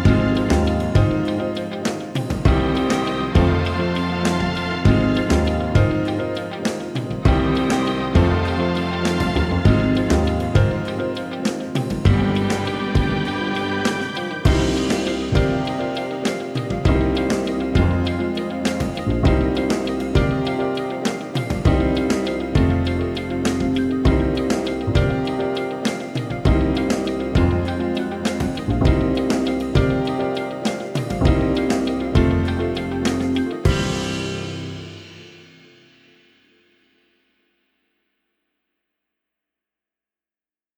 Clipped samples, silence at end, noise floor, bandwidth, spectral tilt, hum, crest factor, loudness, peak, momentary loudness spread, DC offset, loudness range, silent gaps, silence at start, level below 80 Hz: under 0.1%; 5.35 s; under -90 dBFS; 13.5 kHz; -6.5 dB/octave; none; 18 dB; -20 LUFS; -2 dBFS; 7 LU; under 0.1%; 2 LU; none; 0 s; -30 dBFS